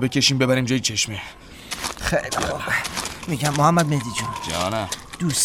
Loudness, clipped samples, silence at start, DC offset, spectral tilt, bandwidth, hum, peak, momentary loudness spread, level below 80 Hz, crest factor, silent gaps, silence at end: -22 LUFS; under 0.1%; 0 s; under 0.1%; -3.5 dB/octave; 16.5 kHz; none; -4 dBFS; 11 LU; -44 dBFS; 18 dB; none; 0 s